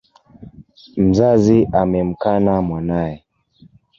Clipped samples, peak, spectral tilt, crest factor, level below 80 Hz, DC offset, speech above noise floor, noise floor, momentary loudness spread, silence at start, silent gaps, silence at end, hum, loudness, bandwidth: under 0.1%; -2 dBFS; -8.5 dB/octave; 16 dB; -40 dBFS; under 0.1%; 35 dB; -51 dBFS; 11 LU; 0.4 s; none; 0.8 s; none; -16 LUFS; 7.4 kHz